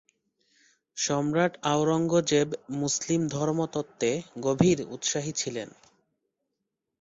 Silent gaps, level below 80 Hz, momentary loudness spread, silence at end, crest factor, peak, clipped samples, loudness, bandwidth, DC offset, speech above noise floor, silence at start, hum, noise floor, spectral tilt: none; -62 dBFS; 8 LU; 1.3 s; 22 dB; -8 dBFS; under 0.1%; -27 LUFS; 8 kHz; under 0.1%; 57 dB; 0.95 s; none; -83 dBFS; -4.5 dB/octave